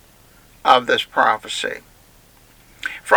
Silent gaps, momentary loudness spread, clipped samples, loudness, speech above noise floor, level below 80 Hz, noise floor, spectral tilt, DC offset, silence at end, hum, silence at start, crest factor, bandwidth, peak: none; 15 LU; under 0.1%; -19 LUFS; 31 dB; -56 dBFS; -50 dBFS; -2 dB/octave; under 0.1%; 0 s; none; 0.65 s; 20 dB; over 20 kHz; 0 dBFS